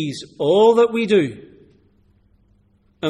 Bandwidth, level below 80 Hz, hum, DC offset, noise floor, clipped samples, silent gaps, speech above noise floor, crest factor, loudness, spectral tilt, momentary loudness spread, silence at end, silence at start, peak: 11.5 kHz; -60 dBFS; none; under 0.1%; -58 dBFS; under 0.1%; none; 42 dB; 16 dB; -17 LUFS; -6 dB/octave; 13 LU; 0 s; 0 s; -4 dBFS